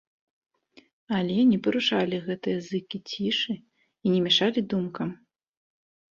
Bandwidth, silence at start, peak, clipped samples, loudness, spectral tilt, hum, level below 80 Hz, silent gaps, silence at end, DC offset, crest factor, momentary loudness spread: 7.2 kHz; 1.1 s; -10 dBFS; under 0.1%; -26 LUFS; -5.5 dB/octave; none; -68 dBFS; none; 0.95 s; under 0.1%; 18 dB; 11 LU